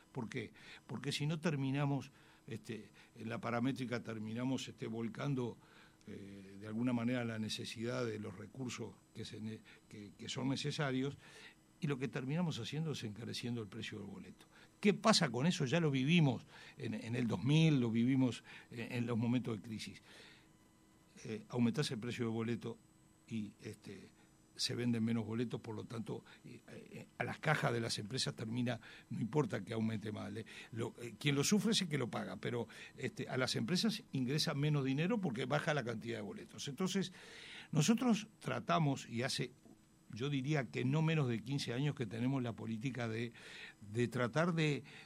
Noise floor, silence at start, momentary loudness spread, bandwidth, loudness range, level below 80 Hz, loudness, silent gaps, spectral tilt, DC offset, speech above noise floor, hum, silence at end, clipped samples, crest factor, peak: -67 dBFS; 0.15 s; 17 LU; 15.5 kHz; 7 LU; -74 dBFS; -38 LUFS; none; -5.5 dB/octave; under 0.1%; 29 dB; none; 0 s; under 0.1%; 24 dB; -14 dBFS